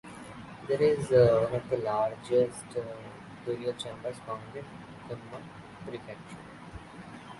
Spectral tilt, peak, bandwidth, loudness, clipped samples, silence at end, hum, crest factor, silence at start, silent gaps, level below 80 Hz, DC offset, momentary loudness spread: -6.5 dB/octave; -10 dBFS; 11.5 kHz; -29 LUFS; under 0.1%; 0 s; none; 22 dB; 0.05 s; none; -60 dBFS; under 0.1%; 22 LU